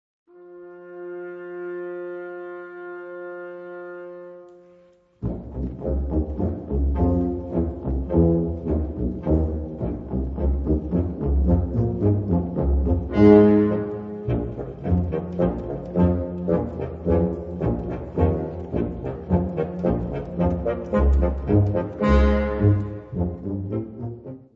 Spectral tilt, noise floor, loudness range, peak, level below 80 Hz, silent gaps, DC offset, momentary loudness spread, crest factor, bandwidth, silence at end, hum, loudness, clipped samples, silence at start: -11 dB/octave; -55 dBFS; 15 LU; -2 dBFS; -30 dBFS; none; under 0.1%; 16 LU; 22 dB; 5.4 kHz; 0.1 s; none; -23 LUFS; under 0.1%; 0.35 s